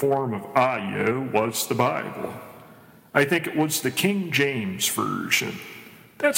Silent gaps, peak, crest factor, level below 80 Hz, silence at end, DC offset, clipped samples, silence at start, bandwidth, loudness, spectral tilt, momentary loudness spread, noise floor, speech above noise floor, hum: none; -4 dBFS; 22 dB; -68 dBFS; 0 s; under 0.1%; under 0.1%; 0 s; 16.5 kHz; -24 LUFS; -4 dB/octave; 12 LU; -50 dBFS; 26 dB; none